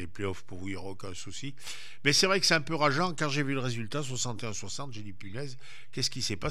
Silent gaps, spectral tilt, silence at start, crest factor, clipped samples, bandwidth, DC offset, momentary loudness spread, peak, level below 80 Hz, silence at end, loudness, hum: none; -3.5 dB/octave; 0 s; 22 dB; under 0.1%; 15 kHz; 2%; 18 LU; -10 dBFS; -60 dBFS; 0 s; -30 LUFS; none